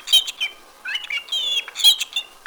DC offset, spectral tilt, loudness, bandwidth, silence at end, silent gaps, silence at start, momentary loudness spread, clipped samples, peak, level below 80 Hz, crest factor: under 0.1%; 4.5 dB/octave; -19 LUFS; over 20 kHz; 0.2 s; none; 0 s; 13 LU; under 0.1%; -4 dBFS; -64 dBFS; 18 dB